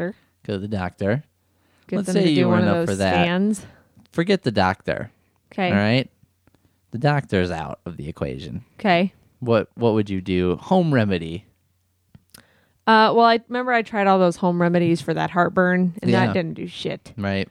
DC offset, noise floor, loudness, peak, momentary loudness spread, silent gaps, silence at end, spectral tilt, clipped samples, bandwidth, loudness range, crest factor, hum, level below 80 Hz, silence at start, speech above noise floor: under 0.1%; -66 dBFS; -21 LUFS; -4 dBFS; 13 LU; none; 0.05 s; -6.5 dB/octave; under 0.1%; 12 kHz; 5 LU; 18 dB; none; -56 dBFS; 0 s; 46 dB